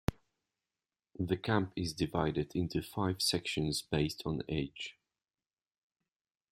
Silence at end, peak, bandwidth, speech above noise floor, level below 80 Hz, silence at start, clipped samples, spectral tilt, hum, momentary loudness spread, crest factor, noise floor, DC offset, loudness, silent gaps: 1.6 s; -14 dBFS; 16 kHz; over 55 dB; -56 dBFS; 0.1 s; under 0.1%; -5 dB/octave; none; 8 LU; 22 dB; under -90 dBFS; under 0.1%; -35 LUFS; none